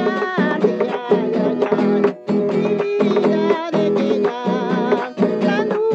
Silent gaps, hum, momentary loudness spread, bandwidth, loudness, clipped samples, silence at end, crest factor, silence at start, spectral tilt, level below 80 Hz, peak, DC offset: none; none; 3 LU; 7.8 kHz; -18 LUFS; under 0.1%; 0 s; 14 dB; 0 s; -7.5 dB/octave; -76 dBFS; -2 dBFS; under 0.1%